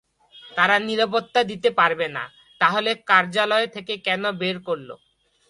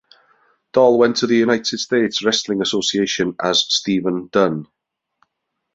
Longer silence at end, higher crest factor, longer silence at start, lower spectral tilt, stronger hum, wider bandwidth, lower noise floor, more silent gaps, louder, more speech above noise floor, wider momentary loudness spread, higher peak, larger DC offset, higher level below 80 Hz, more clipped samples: second, 0.55 s vs 1.1 s; about the same, 20 dB vs 18 dB; second, 0.35 s vs 0.75 s; about the same, -4 dB/octave vs -3.5 dB/octave; neither; first, 11.5 kHz vs 8 kHz; second, -48 dBFS vs -76 dBFS; neither; second, -21 LUFS vs -17 LUFS; second, 27 dB vs 59 dB; first, 11 LU vs 6 LU; about the same, -2 dBFS vs -2 dBFS; neither; second, -68 dBFS vs -60 dBFS; neither